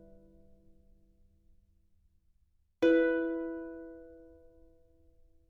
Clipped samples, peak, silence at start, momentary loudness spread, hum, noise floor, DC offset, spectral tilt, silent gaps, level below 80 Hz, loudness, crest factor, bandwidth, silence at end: under 0.1%; -16 dBFS; 2.8 s; 25 LU; none; -71 dBFS; under 0.1%; -6 dB/octave; none; -64 dBFS; -30 LUFS; 20 dB; 6.4 kHz; 1.35 s